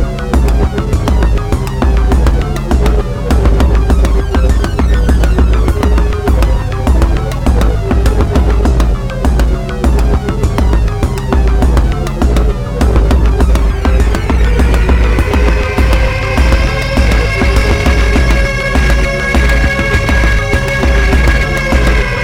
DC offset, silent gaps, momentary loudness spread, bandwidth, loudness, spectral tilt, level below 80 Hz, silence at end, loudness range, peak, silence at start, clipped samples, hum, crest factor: under 0.1%; none; 3 LU; 13 kHz; -12 LUFS; -6.5 dB/octave; -10 dBFS; 0 s; 2 LU; 0 dBFS; 0 s; under 0.1%; none; 10 dB